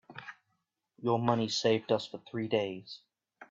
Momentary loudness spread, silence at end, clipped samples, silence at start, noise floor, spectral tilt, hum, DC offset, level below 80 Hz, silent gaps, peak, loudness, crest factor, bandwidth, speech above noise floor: 19 LU; 0.05 s; under 0.1%; 0.1 s; -81 dBFS; -5 dB/octave; none; under 0.1%; -76 dBFS; none; -14 dBFS; -32 LUFS; 20 dB; 7.8 kHz; 50 dB